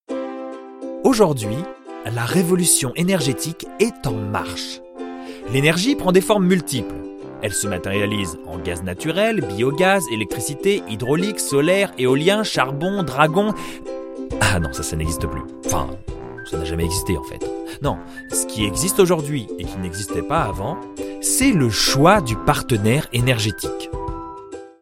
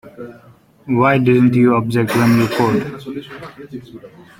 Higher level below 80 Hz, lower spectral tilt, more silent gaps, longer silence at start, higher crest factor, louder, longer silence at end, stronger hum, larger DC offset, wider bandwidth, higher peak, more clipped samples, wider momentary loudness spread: first, -38 dBFS vs -52 dBFS; second, -4.5 dB/octave vs -7 dB/octave; neither; about the same, 0.1 s vs 0.05 s; first, 20 dB vs 14 dB; second, -20 LUFS vs -14 LUFS; second, 0.1 s vs 0.3 s; neither; neither; about the same, 16.5 kHz vs 16.5 kHz; about the same, 0 dBFS vs -2 dBFS; neither; second, 15 LU vs 21 LU